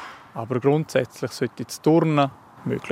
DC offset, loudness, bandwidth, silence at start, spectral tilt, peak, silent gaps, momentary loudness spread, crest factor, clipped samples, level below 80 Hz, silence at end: under 0.1%; -23 LUFS; 16 kHz; 0 s; -6.5 dB/octave; -6 dBFS; none; 14 LU; 18 dB; under 0.1%; -66 dBFS; 0 s